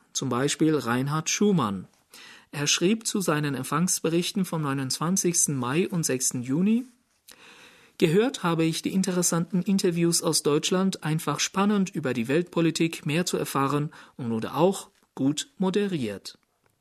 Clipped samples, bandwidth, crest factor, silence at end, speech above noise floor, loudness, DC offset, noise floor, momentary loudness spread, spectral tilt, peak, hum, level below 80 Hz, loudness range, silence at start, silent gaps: under 0.1%; 13.5 kHz; 20 dB; 0.5 s; 29 dB; -25 LUFS; under 0.1%; -54 dBFS; 7 LU; -4.5 dB/octave; -6 dBFS; none; -68 dBFS; 2 LU; 0.15 s; none